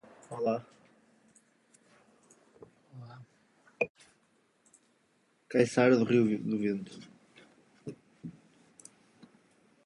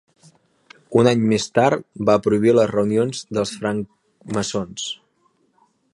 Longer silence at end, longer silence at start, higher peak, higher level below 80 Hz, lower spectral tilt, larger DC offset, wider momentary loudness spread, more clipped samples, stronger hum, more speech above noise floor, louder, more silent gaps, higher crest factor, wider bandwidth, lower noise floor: first, 1.55 s vs 1 s; second, 0.3 s vs 0.9 s; second, -10 dBFS vs -2 dBFS; second, -76 dBFS vs -56 dBFS; about the same, -6.5 dB/octave vs -5.5 dB/octave; neither; first, 28 LU vs 12 LU; neither; neither; about the same, 43 dB vs 45 dB; second, -30 LUFS vs -20 LUFS; first, 3.90-3.95 s vs none; about the same, 24 dB vs 20 dB; about the same, 11.5 kHz vs 11.5 kHz; first, -71 dBFS vs -64 dBFS